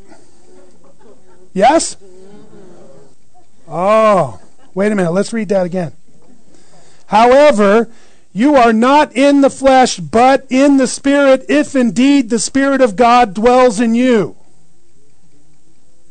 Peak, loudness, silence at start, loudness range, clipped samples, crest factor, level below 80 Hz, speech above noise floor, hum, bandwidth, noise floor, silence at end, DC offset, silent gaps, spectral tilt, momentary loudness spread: -2 dBFS; -11 LUFS; 1.55 s; 7 LU; under 0.1%; 10 dB; -44 dBFS; 45 dB; none; 9.4 kHz; -55 dBFS; 1.8 s; 3%; none; -4.5 dB/octave; 10 LU